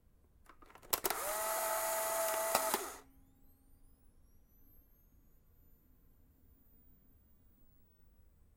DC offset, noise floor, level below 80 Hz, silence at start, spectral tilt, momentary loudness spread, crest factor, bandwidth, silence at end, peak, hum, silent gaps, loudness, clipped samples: under 0.1%; -66 dBFS; -66 dBFS; 0.5 s; -0.5 dB/octave; 17 LU; 30 dB; 16.5 kHz; 0.9 s; -14 dBFS; none; none; -36 LUFS; under 0.1%